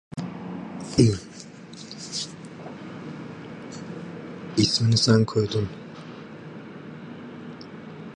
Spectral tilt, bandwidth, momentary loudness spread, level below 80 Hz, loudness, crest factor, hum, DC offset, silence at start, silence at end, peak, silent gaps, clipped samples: -5.5 dB/octave; 11 kHz; 21 LU; -54 dBFS; -24 LUFS; 22 dB; none; under 0.1%; 0.15 s; 0 s; -4 dBFS; none; under 0.1%